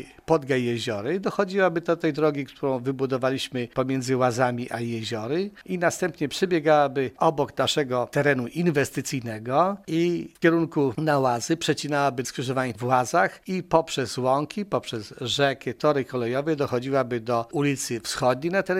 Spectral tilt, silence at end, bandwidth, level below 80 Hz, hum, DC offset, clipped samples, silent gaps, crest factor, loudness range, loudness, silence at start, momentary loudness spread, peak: -5 dB/octave; 0 s; 16 kHz; -60 dBFS; none; under 0.1%; under 0.1%; none; 20 dB; 2 LU; -25 LUFS; 0 s; 6 LU; -4 dBFS